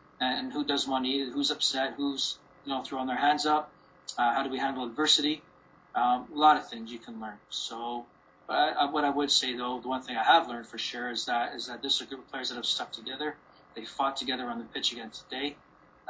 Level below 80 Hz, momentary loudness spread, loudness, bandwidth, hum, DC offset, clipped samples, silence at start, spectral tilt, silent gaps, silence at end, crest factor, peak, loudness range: -70 dBFS; 16 LU; -29 LUFS; 8 kHz; none; under 0.1%; under 0.1%; 0.2 s; -1.5 dB/octave; none; 0.55 s; 22 dB; -8 dBFS; 5 LU